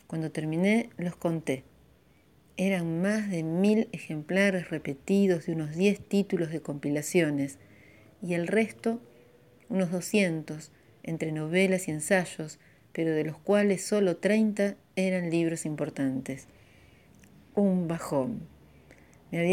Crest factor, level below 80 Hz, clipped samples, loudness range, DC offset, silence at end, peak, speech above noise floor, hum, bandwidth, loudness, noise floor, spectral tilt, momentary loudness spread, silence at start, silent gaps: 18 dB; -66 dBFS; under 0.1%; 4 LU; under 0.1%; 0 s; -10 dBFS; 34 dB; none; 16 kHz; -29 LUFS; -62 dBFS; -6 dB/octave; 11 LU; 0.1 s; none